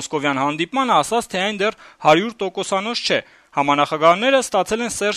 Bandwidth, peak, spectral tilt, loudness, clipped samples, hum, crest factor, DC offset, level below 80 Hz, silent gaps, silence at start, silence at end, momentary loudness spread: 13.5 kHz; -2 dBFS; -3.5 dB/octave; -19 LUFS; under 0.1%; none; 18 dB; under 0.1%; -56 dBFS; none; 0 s; 0 s; 7 LU